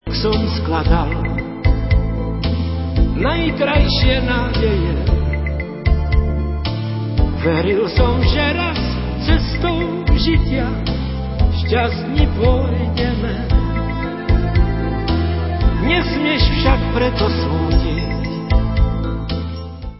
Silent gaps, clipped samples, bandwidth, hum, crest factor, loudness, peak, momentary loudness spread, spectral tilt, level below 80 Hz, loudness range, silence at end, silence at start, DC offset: none; under 0.1%; 5.8 kHz; none; 16 dB; -18 LUFS; 0 dBFS; 6 LU; -10.5 dB/octave; -20 dBFS; 2 LU; 0 s; 0.05 s; 0.2%